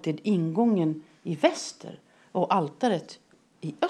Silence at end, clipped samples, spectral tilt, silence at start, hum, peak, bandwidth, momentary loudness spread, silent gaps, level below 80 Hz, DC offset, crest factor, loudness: 0 s; under 0.1%; -6 dB/octave; 0.05 s; none; -6 dBFS; 11 kHz; 15 LU; none; -84 dBFS; under 0.1%; 20 dB; -27 LUFS